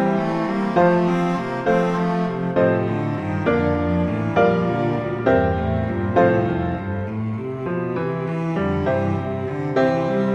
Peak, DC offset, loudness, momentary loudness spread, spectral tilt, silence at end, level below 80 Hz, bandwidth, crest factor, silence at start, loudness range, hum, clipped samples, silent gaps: -4 dBFS; under 0.1%; -21 LUFS; 7 LU; -8.5 dB/octave; 0 s; -42 dBFS; 8 kHz; 16 dB; 0 s; 3 LU; none; under 0.1%; none